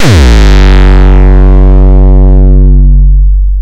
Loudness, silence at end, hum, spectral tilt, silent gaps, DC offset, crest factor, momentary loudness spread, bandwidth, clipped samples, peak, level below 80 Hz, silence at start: -5 LUFS; 0 s; none; -7 dB/octave; none; under 0.1%; 2 dB; 2 LU; 8.2 kHz; 30%; 0 dBFS; -2 dBFS; 0 s